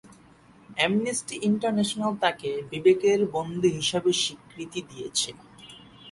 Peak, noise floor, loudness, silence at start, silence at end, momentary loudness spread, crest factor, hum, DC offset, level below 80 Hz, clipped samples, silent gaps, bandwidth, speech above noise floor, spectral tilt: -8 dBFS; -54 dBFS; -26 LUFS; 0.05 s; 0 s; 17 LU; 18 dB; none; under 0.1%; -62 dBFS; under 0.1%; none; 11.5 kHz; 29 dB; -4 dB/octave